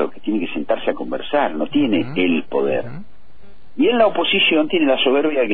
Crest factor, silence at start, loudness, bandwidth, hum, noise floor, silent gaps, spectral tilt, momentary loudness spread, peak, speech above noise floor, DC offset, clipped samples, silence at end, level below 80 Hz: 16 dB; 0 s; -18 LUFS; 4.6 kHz; none; -50 dBFS; none; -8.5 dB/octave; 9 LU; -2 dBFS; 32 dB; 4%; under 0.1%; 0 s; -52 dBFS